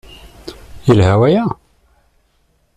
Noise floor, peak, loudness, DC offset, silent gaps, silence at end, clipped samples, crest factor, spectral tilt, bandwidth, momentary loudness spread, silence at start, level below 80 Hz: -59 dBFS; -2 dBFS; -13 LUFS; under 0.1%; none; 1.25 s; under 0.1%; 16 dB; -8 dB/octave; 10.5 kHz; 24 LU; 0.45 s; -40 dBFS